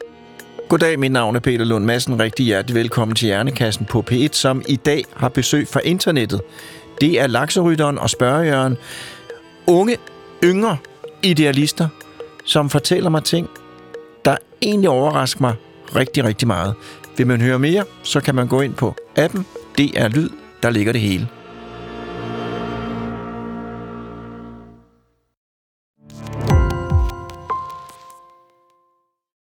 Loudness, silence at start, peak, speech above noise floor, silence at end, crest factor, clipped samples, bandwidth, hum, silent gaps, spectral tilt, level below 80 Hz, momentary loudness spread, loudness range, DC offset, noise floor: -18 LUFS; 0 s; -2 dBFS; 49 dB; 1.3 s; 16 dB; under 0.1%; 18.5 kHz; none; 25.37-25.94 s; -5 dB/octave; -36 dBFS; 18 LU; 9 LU; under 0.1%; -66 dBFS